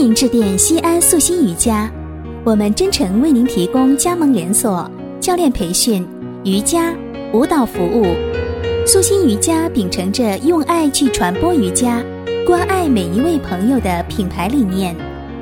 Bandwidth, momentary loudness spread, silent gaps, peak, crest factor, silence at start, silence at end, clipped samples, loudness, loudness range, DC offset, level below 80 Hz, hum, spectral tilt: 17 kHz; 9 LU; none; 0 dBFS; 14 dB; 0 s; 0 s; under 0.1%; -15 LUFS; 3 LU; under 0.1%; -34 dBFS; none; -4 dB/octave